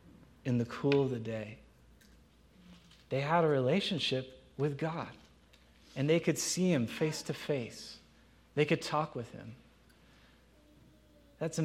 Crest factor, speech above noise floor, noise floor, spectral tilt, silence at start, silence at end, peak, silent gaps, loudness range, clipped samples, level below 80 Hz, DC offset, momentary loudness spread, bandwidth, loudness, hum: 20 dB; 30 dB; -63 dBFS; -5 dB/octave; 0.05 s; 0 s; -14 dBFS; none; 5 LU; under 0.1%; -66 dBFS; under 0.1%; 17 LU; 16 kHz; -33 LUFS; none